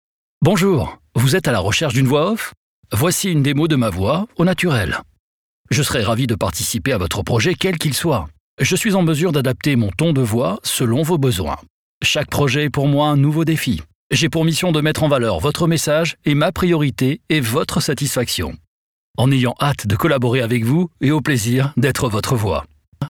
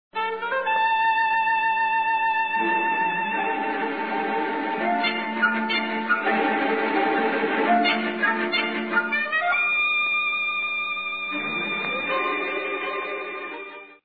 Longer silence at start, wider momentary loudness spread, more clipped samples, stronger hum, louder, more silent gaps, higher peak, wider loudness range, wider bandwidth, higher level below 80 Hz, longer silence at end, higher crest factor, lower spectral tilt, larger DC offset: first, 0.4 s vs 0.15 s; about the same, 5 LU vs 6 LU; neither; neither; first, -17 LUFS vs -23 LUFS; first, 2.57-2.83 s, 5.19-5.65 s, 8.40-8.58 s, 11.70-12.01 s, 13.95-14.10 s, 18.67-19.14 s, 22.88-22.92 s vs none; first, -2 dBFS vs -10 dBFS; about the same, 2 LU vs 3 LU; first, 19.5 kHz vs 5 kHz; first, -44 dBFS vs -76 dBFS; about the same, 0 s vs 0.1 s; about the same, 16 dB vs 14 dB; second, -5 dB/octave vs -6.5 dB/octave; second, under 0.1% vs 0.2%